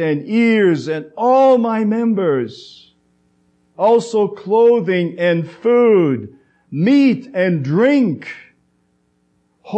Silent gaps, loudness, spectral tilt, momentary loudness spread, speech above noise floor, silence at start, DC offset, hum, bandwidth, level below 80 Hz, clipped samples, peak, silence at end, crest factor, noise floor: none; -15 LUFS; -7.5 dB/octave; 9 LU; 47 dB; 0 s; under 0.1%; none; 8.6 kHz; -72 dBFS; under 0.1%; -4 dBFS; 0 s; 12 dB; -62 dBFS